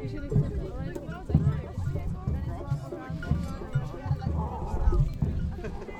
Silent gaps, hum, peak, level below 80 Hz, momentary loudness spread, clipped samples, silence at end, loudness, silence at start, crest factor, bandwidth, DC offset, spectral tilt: none; none; -8 dBFS; -34 dBFS; 9 LU; under 0.1%; 0 s; -31 LUFS; 0 s; 20 dB; 9 kHz; under 0.1%; -9 dB/octave